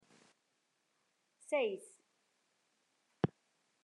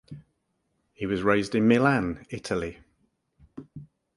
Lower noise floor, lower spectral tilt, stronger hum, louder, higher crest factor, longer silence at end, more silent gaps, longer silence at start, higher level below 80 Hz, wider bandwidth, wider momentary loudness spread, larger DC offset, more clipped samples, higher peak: first, -81 dBFS vs -75 dBFS; about the same, -6 dB/octave vs -6.5 dB/octave; neither; second, -39 LUFS vs -25 LUFS; about the same, 26 dB vs 22 dB; first, 0.55 s vs 0.3 s; neither; first, 1.5 s vs 0.1 s; second, -80 dBFS vs -54 dBFS; about the same, 11.5 kHz vs 11.5 kHz; about the same, 23 LU vs 25 LU; neither; neither; second, -18 dBFS vs -6 dBFS